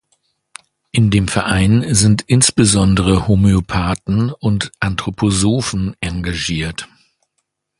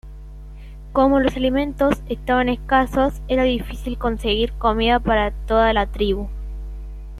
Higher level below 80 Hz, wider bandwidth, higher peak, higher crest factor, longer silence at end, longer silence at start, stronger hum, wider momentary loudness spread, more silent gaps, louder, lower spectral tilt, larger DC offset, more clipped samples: about the same, -32 dBFS vs -30 dBFS; second, 11.5 kHz vs 14 kHz; first, 0 dBFS vs -4 dBFS; about the same, 16 dB vs 16 dB; first, 0.95 s vs 0 s; first, 0.95 s vs 0.05 s; second, none vs 50 Hz at -30 dBFS; second, 9 LU vs 18 LU; neither; first, -15 LUFS vs -20 LUFS; second, -5 dB/octave vs -6.5 dB/octave; neither; neither